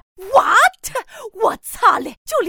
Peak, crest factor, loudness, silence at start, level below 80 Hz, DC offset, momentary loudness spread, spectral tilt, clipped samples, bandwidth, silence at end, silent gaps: 0 dBFS; 16 dB; -16 LUFS; 0.2 s; -50 dBFS; under 0.1%; 14 LU; -1.5 dB/octave; under 0.1%; over 20 kHz; 0 s; 2.17-2.25 s